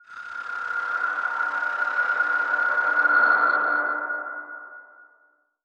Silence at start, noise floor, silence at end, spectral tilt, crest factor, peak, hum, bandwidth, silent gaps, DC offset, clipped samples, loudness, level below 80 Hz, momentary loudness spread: 0.1 s; -63 dBFS; 0.6 s; -2.5 dB/octave; 16 dB; -8 dBFS; none; 7.6 kHz; none; under 0.1%; under 0.1%; -22 LUFS; -80 dBFS; 17 LU